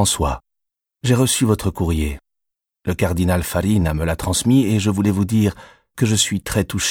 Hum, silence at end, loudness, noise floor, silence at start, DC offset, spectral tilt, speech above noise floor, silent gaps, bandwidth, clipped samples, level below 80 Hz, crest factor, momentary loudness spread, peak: none; 0 s; -19 LUFS; -81 dBFS; 0 s; under 0.1%; -5 dB/octave; 63 dB; none; 17.5 kHz; under 0.1%; -34 dBFS; 16 dB; 10 LU; -4 dBFS